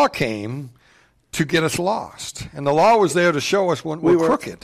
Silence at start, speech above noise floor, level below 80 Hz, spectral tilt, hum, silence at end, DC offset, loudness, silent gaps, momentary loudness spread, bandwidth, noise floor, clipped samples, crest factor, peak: 0 s; 37 dB; -50 dBFS; -5 dB/octave; none; 0.1 s; under 0.1%; -19 LUFS; none; 16 LU; 14.5 kHz; -56 dBFS; under 0.1%; 12 dB; -6 dBFS